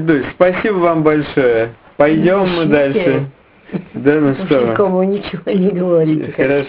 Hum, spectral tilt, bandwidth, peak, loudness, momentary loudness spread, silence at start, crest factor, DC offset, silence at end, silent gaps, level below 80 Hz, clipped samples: none; -10.5 dB/octave; 5.2 kHz; 0 dBFS; -14 LUFS; 7 LU; 0 s; 14 dB; under 0.1%; 0 s; none; -46 dBFS; under 0.1%